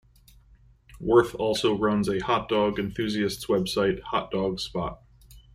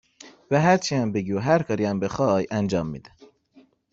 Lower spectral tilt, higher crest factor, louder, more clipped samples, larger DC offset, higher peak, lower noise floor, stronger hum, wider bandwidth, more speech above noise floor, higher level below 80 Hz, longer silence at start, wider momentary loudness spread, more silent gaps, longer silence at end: about the same, -5.5 dB/octave vs -6 dB/octave; about the same, 20 dB vs 18 dB; second, -26 LUFS vs -23 LUFS; neither; neither; about the same, -6 dBFS vs -6 dBFS; about the same, -56 dBFS vs -57 dBFS; neither; first, 15 kHz vs 8 kHz; second, 31 dB vs 35 dB; first, -50 dBFS vs -56 dBFS; first, 0.95 s vs 0.25 s; about the same, 9 LU vs 7 LU; neither; second, 0.15 s vs 0.95 s